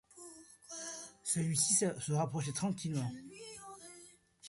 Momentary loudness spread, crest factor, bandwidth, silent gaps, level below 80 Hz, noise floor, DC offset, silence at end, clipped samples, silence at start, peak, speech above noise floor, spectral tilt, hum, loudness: 23 LU; 20 dB; 12 kHz; none; -72 dBFS; -60 dBFS; under 0.1%; 0 s; under 0.1%; 0.15 s; -18 dBFS; 25 dB; -4 dB/octave; none; -35 LUFS